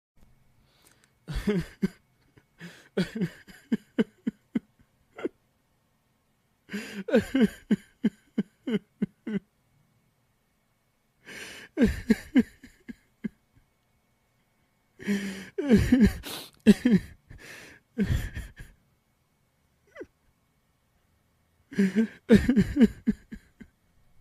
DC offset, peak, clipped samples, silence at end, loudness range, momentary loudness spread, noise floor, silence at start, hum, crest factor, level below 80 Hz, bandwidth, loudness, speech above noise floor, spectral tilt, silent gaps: under 0.1%; -6 dBFS; under 0.1%; 0.85 s; 12 LU; 25 LU; -71 dBFS; 1.3 s; none; 24 dB; -44 dBFS; 15 kHz; -27 LUFS; 46 dB; -7 dB/octave; none